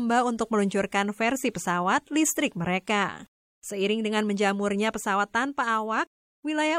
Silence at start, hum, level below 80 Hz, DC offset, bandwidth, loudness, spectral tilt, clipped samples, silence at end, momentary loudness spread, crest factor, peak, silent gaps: 0 s; none; -64 dBFS; under 0.1%; 16.5 kHz; -26 LUFS; -4 dB/octave; under 0.1%; 0 s; 6 LU; 16 dB; -10 dBFS; 3.28-3.62 s, 6.07-6.43 s